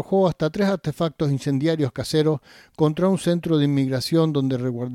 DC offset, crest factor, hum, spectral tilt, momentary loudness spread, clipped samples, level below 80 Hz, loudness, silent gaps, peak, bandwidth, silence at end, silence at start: under 0.1%; 14 dB; none; -7 dB/octave; 4 LU; under 0.1%; -54 dBFS; -22 LUFS; none; -6 dBFS; 15.5 kHz; 0 s; 0 s